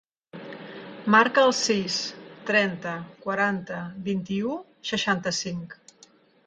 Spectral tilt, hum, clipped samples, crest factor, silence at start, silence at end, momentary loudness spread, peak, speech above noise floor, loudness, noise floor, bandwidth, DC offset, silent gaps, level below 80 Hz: -3.5 dB/octave; none; under 0.1%; 22 dB; 0.35 s; 0.75 s; 20 LU; -4 dBFS; 32 dB; -25 LUFS; -57 dBFS; 9.4 kHz; under 0.1%; none; -66 dBFS